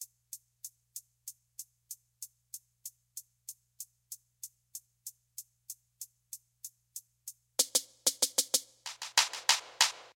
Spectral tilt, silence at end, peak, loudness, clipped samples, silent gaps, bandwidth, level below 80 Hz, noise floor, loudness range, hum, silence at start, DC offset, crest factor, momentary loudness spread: 3 dB/octave; 0.05 s; -10 dBFS; -29 LUFS; under 0.1%; none; 17 kHz; -86 dBFS; -53 dBFS; 17 LU; 60 Hz at -80 dBFS; 0 s; under 0.1%; 28 dB; 21 LU